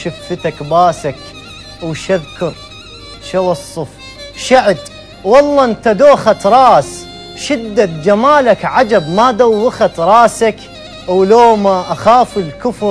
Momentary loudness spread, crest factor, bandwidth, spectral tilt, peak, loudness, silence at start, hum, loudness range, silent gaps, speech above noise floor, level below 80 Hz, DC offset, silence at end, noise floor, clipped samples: 21 LU; 12 dB; 11 kHz; -5 dB/octave; 0 dBFS; -11 LUFS; 0 s; none; 8 LU; none; 21 dB; -42 dBFS; under 0.1%; 0 s; -32 dBFS; 0.6%